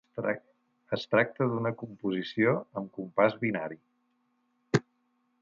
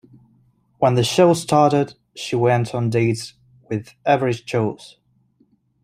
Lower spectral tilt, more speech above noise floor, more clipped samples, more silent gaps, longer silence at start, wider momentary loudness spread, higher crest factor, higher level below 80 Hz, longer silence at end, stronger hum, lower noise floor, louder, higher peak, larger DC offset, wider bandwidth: about the same, -7 dB/octave vs -6 dB/octave; about the same, 44 dB vs 43 dB; neither; neither; second, 0.15 s vs 0.8 s; about the same, 11 LU vs 13 LU; about the same, 22 dB vs 18 dB; second, -72 dBFS vs -58 dBFS; second, 0.6 s vs 0.95 s; neither; first, -74 dBFS vs -61 dBFS; second, -30 LUFS vs -19 LUFS; second, -8 dBFS vs -2 dBFS; neither; second, 7.8 kHz vs 15.5 kHz